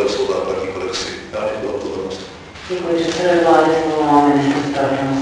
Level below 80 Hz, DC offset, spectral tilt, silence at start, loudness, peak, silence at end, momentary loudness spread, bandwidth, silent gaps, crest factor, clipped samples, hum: -48 dBFS; under 0.1%; -5 dB/octave; 0 s; -17 LUFS; -2 dBFS; 0 s; 13 LU; 10.5 kHz; none; 16 dB; under 0.1%; none